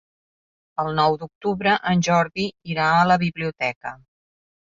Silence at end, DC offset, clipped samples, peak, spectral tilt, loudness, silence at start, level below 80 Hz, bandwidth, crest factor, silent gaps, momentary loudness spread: 0.75 s; under 0.1%; under 0.1%; -4 dBFS; -5.5 dB/octave; -21 LUFS; 0.8 s; -56 dBFS; 7.6 kHz; 18 dB; 1.35-1.41 s, 3.76-3.81 s; 10 LU